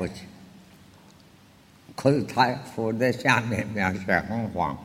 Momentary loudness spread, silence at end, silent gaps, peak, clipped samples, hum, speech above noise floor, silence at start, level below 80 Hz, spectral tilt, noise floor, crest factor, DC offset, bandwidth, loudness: 12 LU; 0 s; none; -4 dBFS; under 0.1%; none; 29 dB; 0 s; -56 dBFS; -6 dB/octave; -54 dBFS; 22 dB; under 0.1%; 16 kHz; -25 LUFS